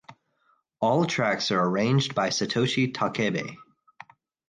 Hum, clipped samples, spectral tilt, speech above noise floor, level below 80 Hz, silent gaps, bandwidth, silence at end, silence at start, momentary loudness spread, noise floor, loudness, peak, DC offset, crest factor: none; under 0.1%; -5 dB/octave; 44 dB; -66 dBFS; none; 9.8 kHz; 0.85 s; 0.1 s; 5 LU; -69 dBFS; -25 LUFS; -10 dBFS; under 0.1%; 16 dB